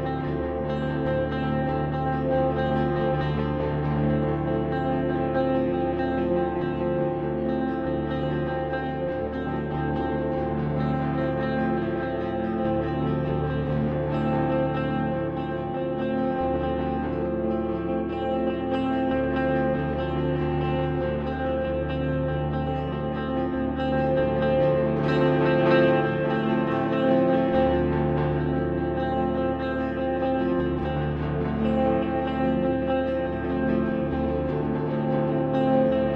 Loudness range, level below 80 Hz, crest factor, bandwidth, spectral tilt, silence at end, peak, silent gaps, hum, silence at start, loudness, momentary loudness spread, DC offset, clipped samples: 5 LU; -40 dBFS; 16 dB; 5.4 kHz; -10 dB/octave; 0 s; -8 dBFS; none; none; 0 s; -25 LUFS; 6 LU; under 0.1%; under 0.1%